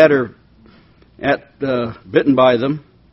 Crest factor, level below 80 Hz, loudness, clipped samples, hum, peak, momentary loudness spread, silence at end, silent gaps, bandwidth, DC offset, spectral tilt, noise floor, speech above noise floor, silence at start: 16 dB; -52 dBFS; -17 LUFS; under 0.1%; none; 0 dBFS; 11 LU; 0.3 s; none; 6 kHz; under 0.1%; -4.5 dB/octave; -48 dBFS; 33 dB; 0 s